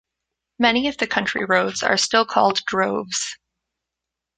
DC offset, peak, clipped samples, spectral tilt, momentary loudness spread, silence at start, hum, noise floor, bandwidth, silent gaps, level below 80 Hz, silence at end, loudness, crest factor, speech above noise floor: under 0.1%; -2 dBFS; under 0.1%; -2.5 dB/octave; 7 LU; 0.6 s; none; -85 dBFS; 9.6 kHz; none; -58 dBFS; 1.05 s; -20 LUFS; 20 dB; 65 dB